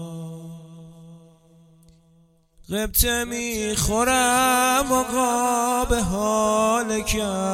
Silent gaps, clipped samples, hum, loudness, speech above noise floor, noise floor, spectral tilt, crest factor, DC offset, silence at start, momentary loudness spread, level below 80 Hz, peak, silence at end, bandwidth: none; under 0.1%; none; -21 LUFS; 37 dB; -58 dBFS; -3 dB/octave; 20 dB; under 0.1%; 0 s; 16 LU; -36 dBFS; -4 dBFS; 0 s; 16.5 kHz